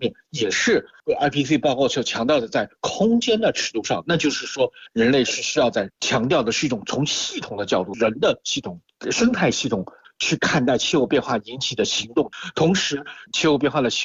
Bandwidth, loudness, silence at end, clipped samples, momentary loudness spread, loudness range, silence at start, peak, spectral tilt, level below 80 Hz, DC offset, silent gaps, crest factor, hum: 8 kHz; -21 LUFS; 0 s; under 0.1%; 7 LU; 2 LU; 0 s; -8 dBFS; -4 dB/octave; -54 dBFS; under 0.1%; none; 14 dB; none